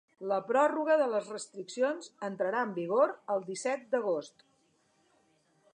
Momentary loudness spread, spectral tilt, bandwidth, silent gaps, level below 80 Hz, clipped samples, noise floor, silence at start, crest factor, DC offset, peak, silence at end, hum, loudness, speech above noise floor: 11 LU; -4.5 dB/octave; 10 kHz; none; -90 dBFS; under 0.1%; -71 dBFS; 0.2 s; 20 dB; under 0.1%; -14 dBFS; 1.45 s; none; -31 LUFS; 40 dB